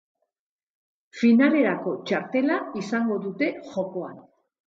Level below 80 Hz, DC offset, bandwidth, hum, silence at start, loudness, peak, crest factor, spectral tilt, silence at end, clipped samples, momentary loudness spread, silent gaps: -74 dBFS; under 0.1%; 7.6 kHz; none; 1.15 s; -24 LUFS; -6 dBFS; 18 dB; -6.5 dB/octave; 0.45 s; under 0.1%; 13 LU; none